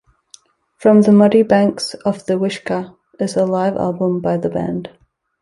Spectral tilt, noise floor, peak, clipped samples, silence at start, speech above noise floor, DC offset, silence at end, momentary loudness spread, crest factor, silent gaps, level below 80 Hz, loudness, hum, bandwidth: -7 dB/octave; -48 dBFS; -2 dBFS; under 0.1%; 0.8 s; 33 dB; under 0.1%; 0.55 s; 14 LU; 14 dB; none; -54 dBFS; -16 LUFS; none; 11.5 kHz